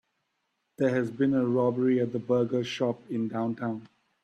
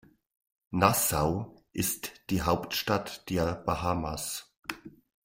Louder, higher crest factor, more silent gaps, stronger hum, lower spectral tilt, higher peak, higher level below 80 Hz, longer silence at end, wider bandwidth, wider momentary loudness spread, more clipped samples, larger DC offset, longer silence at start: about the same, -28 LUFS vs -30 LUFS; second, 16 dB vs 24 dB; second, none vs 4.59-4.63 s; neither; first, -7.5 dB/octave vs -4 dB/octave; second, -14 dBFS vs -8 dBFS; second, -70 dBFS vs -50 dBFS; about the same, 0.4 s vs 0.35 s; second, 8.4 kHz vs 16 kHz; second, 7 LU vs 14 LU; neither; neither; about the same, 0.8 s vs 0.7 s